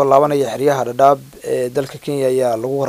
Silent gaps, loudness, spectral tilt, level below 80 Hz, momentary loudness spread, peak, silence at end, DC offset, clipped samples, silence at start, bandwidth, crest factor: none; -17 LUFS; -6 dB/octave; -58 dBFS; 9 LU; 0 dBFS; 0 s; under 0.1%; under 0.1%; 0 s; 16 kHz; 16 dB